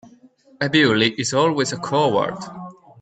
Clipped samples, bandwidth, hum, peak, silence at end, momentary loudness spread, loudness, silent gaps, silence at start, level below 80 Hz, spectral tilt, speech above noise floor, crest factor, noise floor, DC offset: under 0.1%; 9.2 kHz; none; -4 dBFS; 0.3 s; 18 LU; -19 LUFS; none; 0.6 s; -60 dBFS; -4.5 dB/octave; 32 dB; 18 dB; -51 dBFS; under 0.1%